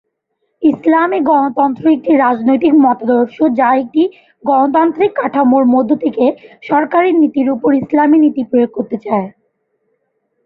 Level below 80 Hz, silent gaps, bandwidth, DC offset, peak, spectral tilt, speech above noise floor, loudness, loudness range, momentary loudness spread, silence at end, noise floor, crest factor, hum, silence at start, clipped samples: -58 dBFS; none; 4.6 kHz; under 0.1%; 0 dBFS; -9 dB/octave; 56 dB; -13 LUFS; 1 LU; 7 LU; 1.15 s; -68 dBFS; 12 dB; none; 0.6 s; under 0.1%